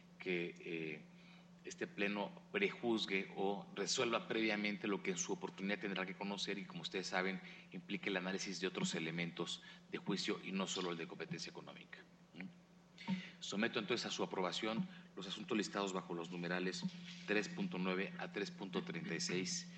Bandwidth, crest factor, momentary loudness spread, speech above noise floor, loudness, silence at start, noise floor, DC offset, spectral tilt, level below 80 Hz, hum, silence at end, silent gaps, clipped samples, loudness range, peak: 9 kHz; 20 dB; 13 LU; 21 dB; -42 LUFS; 0 s; -63 dBFS; under 0.1%; -4 dB/octave; -82 dBFS; none; 0 s; none; under 0.1%; 5 LU; -22 dBFS